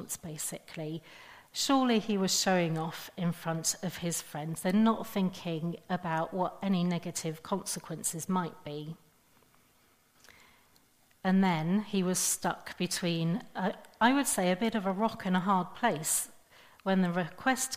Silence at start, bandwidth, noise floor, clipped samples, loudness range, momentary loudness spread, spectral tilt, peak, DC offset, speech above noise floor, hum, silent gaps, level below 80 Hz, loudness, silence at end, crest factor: 0 s; 15.5 kHz; -66 dBFS; under 0.1%; 7 LU; 12 LU; -4 dB/octave; -10 dBFS; under 0.1%; 35 dB; none; none; -68 dBFS; -31 LUFS; 0 s; 20 dB